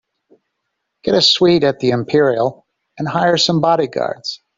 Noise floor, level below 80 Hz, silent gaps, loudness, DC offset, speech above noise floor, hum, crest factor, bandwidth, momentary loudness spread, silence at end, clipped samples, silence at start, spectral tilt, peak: -74 dBFS; -56 dBFS; none; -15 LUFS; under 0.1%; 59 dB; none; 16 dB; 7.8 kHz; 11 LU; 0.2 s; under 0.1%; 1.05 s; -5 dB/octave; 0 dBFS